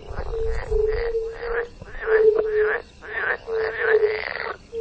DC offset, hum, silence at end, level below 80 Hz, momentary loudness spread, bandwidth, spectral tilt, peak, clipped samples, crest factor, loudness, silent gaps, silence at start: under 0.1%; none; 0 s; -36 dBFS; 12 LU; 8 kHz; -6 dB/octave; -6 dBFS; under 0.1%; 16 dB; -23 LUFS; none; 0 s